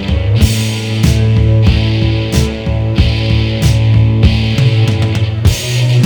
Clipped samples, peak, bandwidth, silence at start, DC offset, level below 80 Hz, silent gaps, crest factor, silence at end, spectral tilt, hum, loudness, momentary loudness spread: 0.2%; 0 dBFS; 19.5 kHz; 0 s; under 0.1%; -18 dBFS; none; 10 dB; 0 s; -6 dB/octave; none; -12 LUFS; 4 LU